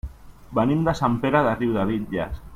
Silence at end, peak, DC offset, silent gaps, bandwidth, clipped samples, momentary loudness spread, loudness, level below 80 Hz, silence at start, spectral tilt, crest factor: 0 s; -6 dBFS; under 0.1%; none; 15.5 kHz; under 0.1%; 8 LU; -23 LUFS; -40 dBFS; 0.05 s; -7.5 dB/octave; 18 dB